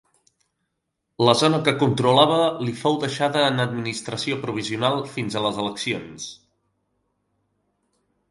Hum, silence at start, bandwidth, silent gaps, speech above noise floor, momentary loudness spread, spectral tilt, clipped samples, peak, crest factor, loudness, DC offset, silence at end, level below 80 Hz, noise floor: none; 1.2 s; 11.5 kHz; none; 56 dB; 11 LU; -5 dB/octave; under 0.1%; 0 dBFS; 24 dB; -21 LUFS; under 0.1%; 1.95 s; -62 dBFS; -78 dBFS